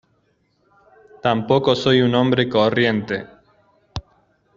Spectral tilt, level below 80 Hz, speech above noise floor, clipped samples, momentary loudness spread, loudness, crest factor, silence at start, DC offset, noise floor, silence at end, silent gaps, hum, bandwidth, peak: -4 dB/octave; -50 dBFS; 47 dB; under 0.1%; 19 LU; -18 LUFS; 20 dB; 1.25 s; under 0.1%; -64 dBFS; 0.55 s; none; none; 7.6 kHz; -2 dBFS